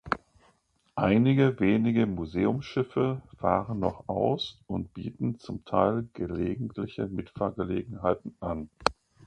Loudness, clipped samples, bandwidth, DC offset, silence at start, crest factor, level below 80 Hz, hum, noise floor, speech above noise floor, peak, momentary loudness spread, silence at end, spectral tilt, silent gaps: -29 LUFS; under 0.1%; 9.4 kHz; under 0.1%; 0.05 s; 26 dB; -52 dBFS; none; -68 dBFS; 40 dB; -4 dBFS; 11 LU; 0.35 s; -7.5 dB/octave; none